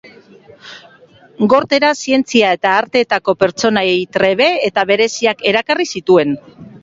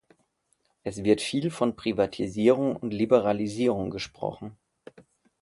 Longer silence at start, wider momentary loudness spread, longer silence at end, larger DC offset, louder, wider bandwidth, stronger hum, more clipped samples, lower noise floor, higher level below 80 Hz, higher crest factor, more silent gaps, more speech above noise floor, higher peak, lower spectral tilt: second, 0.05 s vs 0.85 s; second, 4 LU vs 12 LU; second, 0.05 s vs 0.9 s; neither; first, -14 LUFS vs -26 LUFS; second, 7.8 kHz vs 11.5 kHz; neither; neither; second, -45 dBFS vs -72 dBFS; about the same, -56 dBFS vs -58 dBFS; second, 14 dB vs 22 dB; neither; second, 31 dB vs 46 dB; first, 0 dBFS vs -6 dBFS; second, -4 dB/octave vs -6 dB/octave